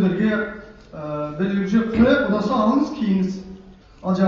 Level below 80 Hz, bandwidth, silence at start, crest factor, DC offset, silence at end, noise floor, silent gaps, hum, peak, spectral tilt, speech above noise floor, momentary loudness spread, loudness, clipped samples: -44 dBFS; 7 kHz; 0 s; 16 dB; under 0.1%; 0 s; -44 dBFS; none; none; -4 dBFS; -6.5 dB/octave; 24 dB; 17 LU; -21 LUFS; under 0.1%